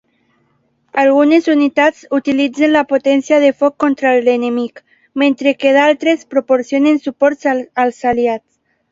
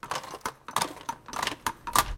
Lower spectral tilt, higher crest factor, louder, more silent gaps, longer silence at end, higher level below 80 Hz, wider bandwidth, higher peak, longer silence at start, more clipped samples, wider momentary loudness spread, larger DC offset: first, -4.5 dB/octave vs -1.5 dB/octave; second, 14 dB vs 30 dB; first, -13 LUFS vs -32 LUFS; neither; first, 0.55 s vs 0 s; second, -56 dBFS vs -46 dBFS; second, 7.8 kHz vs 17 kHz; about the same, 0 dBFS vs -2 dBFS; first, 0.95 s vs 0.05 s; neither; second, 7 LU vs 11 LU; neither